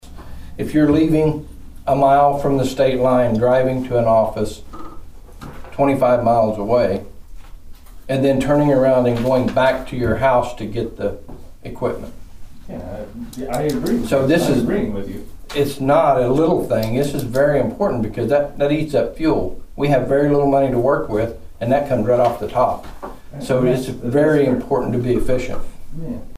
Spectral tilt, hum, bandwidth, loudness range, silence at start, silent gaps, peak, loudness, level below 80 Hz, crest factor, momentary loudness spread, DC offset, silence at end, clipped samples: -7 dB/octave; none; 15.5 kHz; 4 LU; 0.05 s; none; -4 dBFS; -18 LUFS; -36 dBFS; 14 dB; 17 LU; under 0.1%; 0 s; under 0.1%